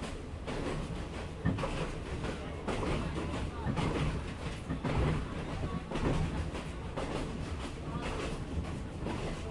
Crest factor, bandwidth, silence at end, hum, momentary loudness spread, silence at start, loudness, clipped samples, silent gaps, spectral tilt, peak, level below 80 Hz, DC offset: 18 dB; 11.5 kHz; 0 s; none; 7 LU; 0 s; -37 LUFS; under 0.1%; none; -6.5 dB/octave; -18 dBFS; -42 dBFS; under 0.1%